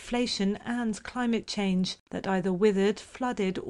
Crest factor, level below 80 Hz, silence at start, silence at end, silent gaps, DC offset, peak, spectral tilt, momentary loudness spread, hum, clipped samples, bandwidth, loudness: 16 dB; -56 dBFS; 0 s; 0 s; 2.00-2.06 s; under 0.1%; -12 dBFS; -5.5 dB/octave; 8 LU; none; under 0.1%; 11 kHz; -29 LUFS